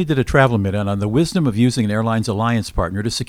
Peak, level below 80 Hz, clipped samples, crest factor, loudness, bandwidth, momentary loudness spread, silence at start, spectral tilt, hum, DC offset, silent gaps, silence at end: 0 dBFS; -34 dBFS; under 0.1%; 16 dB; -18 LUFS; 15 kHz; 6 LU; 0 s; -6 dB/octave; none; under 0.1%; none; 0 s